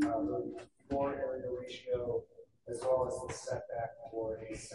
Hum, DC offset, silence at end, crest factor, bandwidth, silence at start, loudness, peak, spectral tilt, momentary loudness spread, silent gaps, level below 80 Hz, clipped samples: none; under 0.1%; 0 s; 18 dB; 11.5 kHz; 0 s; -38 LUFS; -20 dBFS; -5.5 dB/octave; 10 LU; none; -60 dBFS; under 0.1%